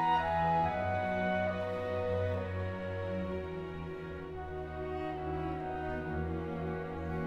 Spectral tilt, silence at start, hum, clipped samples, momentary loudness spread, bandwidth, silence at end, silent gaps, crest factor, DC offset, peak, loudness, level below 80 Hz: -8 dB/octave; 0 s; none; under 0.1%; 11 LU; 8.2 kHz; 0 s; none; 16 dB; under 0.1%; -18 dBFS; -36 LUFS; -50 dBFS